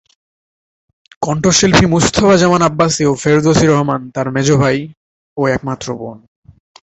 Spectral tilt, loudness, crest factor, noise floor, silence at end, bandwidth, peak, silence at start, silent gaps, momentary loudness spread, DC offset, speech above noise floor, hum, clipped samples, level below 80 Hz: -5 dB/octave; -13 LUFS; 14 dB; under -90 dBFS; 0.65 s; 8.2 kHz; 0 dBFS; 1.2 s; 4.97-5.36 s; 13 LU; under 0.1%; over 78 dB; none; under 0.1%; -38 dBFS